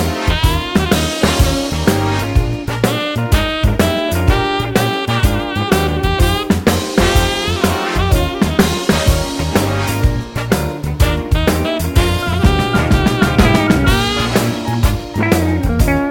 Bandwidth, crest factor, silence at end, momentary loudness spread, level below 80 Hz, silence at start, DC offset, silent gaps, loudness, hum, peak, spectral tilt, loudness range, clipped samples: 17 kHz; 14 dB; 0 s; 4 LU; -20 dBFS; 0 s; under 0.1%; none; -15 LUFS; none; 0 dBFS; -5 dB/octave; 2 LU; under 0.1%